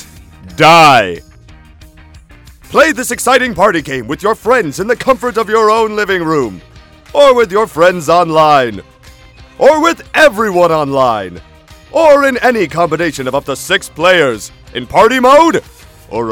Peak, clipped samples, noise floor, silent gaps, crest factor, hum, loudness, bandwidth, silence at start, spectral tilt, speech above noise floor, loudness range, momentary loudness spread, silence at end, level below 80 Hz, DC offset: 0 dBFS; 1%; -38 dBFS; none; 12 dB; none; -10 LUFS; 19 kHz; 0 s; -4 dB/octave; 28 dB; 3 LU; 12 LU; 0 s; -40 dBFS; under 0.1%